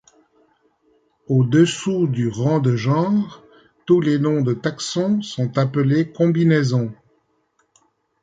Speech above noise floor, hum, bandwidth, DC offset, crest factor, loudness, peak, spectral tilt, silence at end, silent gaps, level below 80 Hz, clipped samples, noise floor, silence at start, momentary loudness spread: 48 dB; none; 9.4 kHz; under 0.1%; 16 dB; -19 LUFS; -4 dBFS; -7 dB/octave; 1.3 s; none; -60 dBFS; under 0.1%; -66 dBFS; 1.3 s; 7 LU